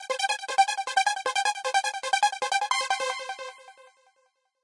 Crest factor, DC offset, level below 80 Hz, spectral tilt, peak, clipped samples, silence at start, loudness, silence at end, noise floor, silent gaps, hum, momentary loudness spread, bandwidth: 18 dB; under 0.1%; -88 dBFS; 3.5 dB/octave; -10 dBFS; under 0.1%; 0 s; -26 LUFS; 0.8 s; -71 dBFS; none; none; 8 LU; 11.5 kHz